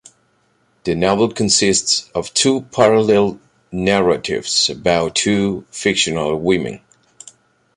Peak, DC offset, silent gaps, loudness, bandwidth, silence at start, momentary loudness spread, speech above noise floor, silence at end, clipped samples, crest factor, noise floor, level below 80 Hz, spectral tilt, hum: 0 dBFS; under 0.1%; none; -16 LUFS; 11.5 kHz; 0.85 s; 8 LU; 44 dB; 1 s; under 0.1%; 16 dB; -60 dBFS; -46 dBFS; -3.5 dB/octave; none